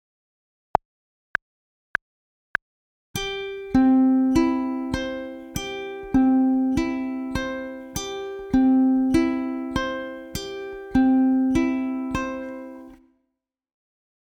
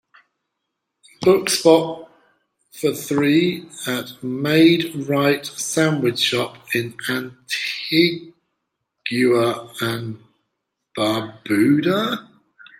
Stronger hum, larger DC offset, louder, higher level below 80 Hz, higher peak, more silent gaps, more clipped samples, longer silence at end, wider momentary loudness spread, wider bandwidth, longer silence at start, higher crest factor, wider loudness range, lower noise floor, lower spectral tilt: neither; neither; second, -24 LUFS vs -19 LUFS; first, -44 dBFS vs -64 dBFS; about the same, -2 dBFS vs -2 dBFS; neither; neither; first, 1.4 s vs 0.6 s; about the same, 14 LU vs 13 LU; about the same, 17 kHz vs 16.5 kHz; first, 3.15 s vs 1.2 s; about the same, 22 dB vs 20 dB; about the same, 5 LU vs 3 LU; about the same, -79 dBFS vs -78 dBFS; about the same, -5.5 dB/octave vs -4.5 dB/octave